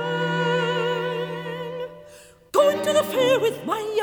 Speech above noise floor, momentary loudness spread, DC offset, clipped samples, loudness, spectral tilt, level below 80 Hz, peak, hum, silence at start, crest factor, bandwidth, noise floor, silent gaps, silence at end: 26 dB; 12 LU; under 0.1%; under 0.1%; -23 LUFS; -4.5 dB/octave; -64 dBFS; -6 dBFS; none; 0 s; 18 dB; over 20 kHz; -48 dBFS; none; 0 s